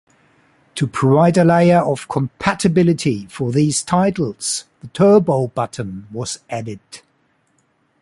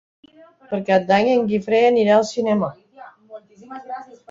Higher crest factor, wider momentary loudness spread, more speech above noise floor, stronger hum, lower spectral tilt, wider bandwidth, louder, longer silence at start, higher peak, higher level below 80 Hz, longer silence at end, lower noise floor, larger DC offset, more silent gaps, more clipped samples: about the same, 16 dB vs 16 dB; second, 15 LU vs 19 LU; first, 46 dB vs 26 dB; neither; about the same, -6 dB/octave vs -6 dB/octave; first, 11.5 kHz vs 7.8 kHz; about the same, -17 LUFS vs -18 LUFS; about the same, 0.75 s vs 0.7 s; about the same, -2 dBFS vs -4 dBFS; first, -50 dBFS vs -62 dBFS; first, 1.05 s vs 0.25 s; first, -62 dBFS vs -44 dBFS; neither; neither; neither